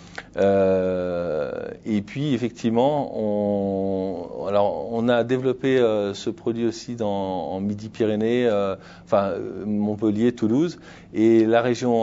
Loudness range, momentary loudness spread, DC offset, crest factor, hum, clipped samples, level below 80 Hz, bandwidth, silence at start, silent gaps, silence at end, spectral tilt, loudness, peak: 2 LU; 9 LU; under 0.1%; 18 dB; none; under 0.1%; -56 dBFS; 7.8 kHz; 0 s; none; 0 s; -7 dB/octave; -23 LUFS; -4 dBFS